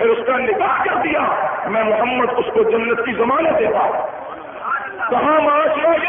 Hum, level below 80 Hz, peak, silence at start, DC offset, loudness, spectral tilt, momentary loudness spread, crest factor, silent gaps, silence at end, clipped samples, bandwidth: none; -52 dBFS; -4 dBFS; 0 s; under 0.1%; -17 LUFS; -10 dB/octave; 8 LU; 12 dB; none; 0 s; under 0.1%; 3.7 kHz